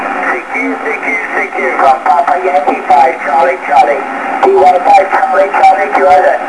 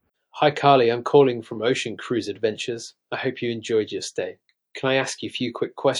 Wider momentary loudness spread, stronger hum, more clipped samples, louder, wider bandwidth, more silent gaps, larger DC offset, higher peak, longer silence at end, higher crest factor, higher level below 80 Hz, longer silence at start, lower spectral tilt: second, 7 LU vs 13 LU; neither; first, 2% vs under 0.1%; first, -9 LUFS vs -23 LUFS; about the same, 11 kHz vs 12 kHz; neither; first, 0.5% vs under 0.1%; about the same, 0 dBFS vs -2 dBFS; about the same, 0 s vs 0 s; second, 10 dB vs 20 dB; first, -52 dBFS vs -72 dBFS; second, 0 s vs 0.35 s; about the same, -4 dB/octave vs -4.5 dB/octave